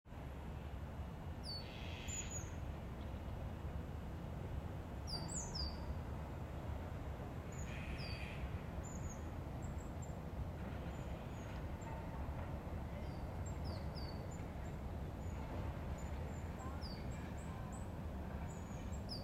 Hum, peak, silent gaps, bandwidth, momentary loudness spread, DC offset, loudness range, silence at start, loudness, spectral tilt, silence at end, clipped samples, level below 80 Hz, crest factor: none; -30 dBFS; none; 16 kHz; 4 LU; under 0.1%; 1 LU; 0.05 s; -47 LUFS; -5 dB/octave; 0 s; under 0.1%; -50 dBFS; 14 dB